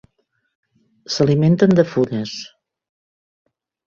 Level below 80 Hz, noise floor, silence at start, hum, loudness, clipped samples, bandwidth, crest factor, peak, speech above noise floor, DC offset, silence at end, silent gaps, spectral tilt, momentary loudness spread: -56 dBFS; -68 dBFS; 1.1 s; none; -17 LUFS; under 0.1%; 7.6 kHz; 18 dB; -2 dBFS; 52 dB; under 0.1%; 1.4 s; none; -7 dB/octave; 16 LU